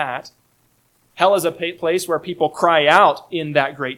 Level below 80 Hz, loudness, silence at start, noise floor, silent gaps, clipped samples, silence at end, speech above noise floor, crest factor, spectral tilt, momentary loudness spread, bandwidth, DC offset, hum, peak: -66 dBFS; -17 LUFS; 0 s; -61 dBFS; none; under 0.1%; 0 s; 43 dB; 18 dB; -4 dB/octave; 11 LU; 16.5 kHz; under 0.1%; none; 0 dBFS